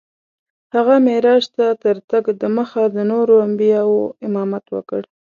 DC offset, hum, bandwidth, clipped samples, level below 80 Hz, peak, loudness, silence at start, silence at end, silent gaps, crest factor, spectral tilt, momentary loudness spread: under 0.1%; none; 7.2 kHz; under 0.1%; -68 dBFS; 0 dBFS; -16 LUFS; 0.75 s; 0.35 s; 2.04-2.08 s; 16 dB; -7 dB/octave; 11 LU